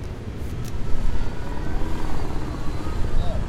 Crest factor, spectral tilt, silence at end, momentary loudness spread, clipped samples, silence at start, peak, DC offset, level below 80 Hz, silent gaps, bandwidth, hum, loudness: 14 dB; -6.5 dB/octave; 0 s; 4 LU; under 0.1%; 0 s; -6 dBFS; under 0.1%; -26 dBFS; none; 8 kHz; none; -30 LUFS